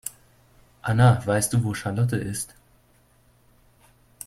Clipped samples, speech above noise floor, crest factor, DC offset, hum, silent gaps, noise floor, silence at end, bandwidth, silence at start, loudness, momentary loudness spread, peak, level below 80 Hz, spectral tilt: under 0.1%; 38 dB; 20 dB; under 0.1%; none; none; -60 dBFS; 1.8 s; 15.5 kHz; 0.05 s; -23 LUFS; 15 LU; -6 dBFS; -52 dBFS; -5.5 dB/octave